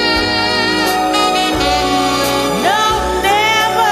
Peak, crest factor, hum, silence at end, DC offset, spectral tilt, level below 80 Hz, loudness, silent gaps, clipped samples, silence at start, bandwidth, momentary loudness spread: 0 dBFS; 14 dB; none; 0 s; under 0.1%; -3 dB/octave; -32 dBFS; -13 LUFS; none; under 0.1%; 0 s; 14 kHz; 2 LU